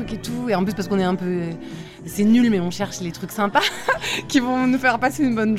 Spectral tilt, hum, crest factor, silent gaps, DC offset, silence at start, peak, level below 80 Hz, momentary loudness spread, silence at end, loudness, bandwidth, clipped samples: -5 dB/octave; none; 18 dB; none; under 0.1%; 0 s; -4 dBFS; -48 dBFS; 12 LU; 0 s; -21 LUFS; 15.5 kHz; under 0.1%